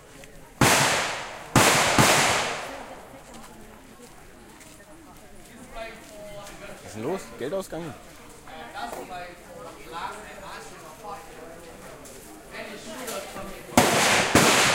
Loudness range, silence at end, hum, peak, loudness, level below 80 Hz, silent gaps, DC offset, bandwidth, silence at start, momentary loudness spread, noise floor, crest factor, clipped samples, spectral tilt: 21 LU; 0 s; none; -4 dBFS; -22 LUFS; -50 dBFS; none; under 0.1%; 16.5 kHz; 0.1 s; 25 LU; -47 dBFS; 24 dB; under 0.1%; -2.5 dB/octave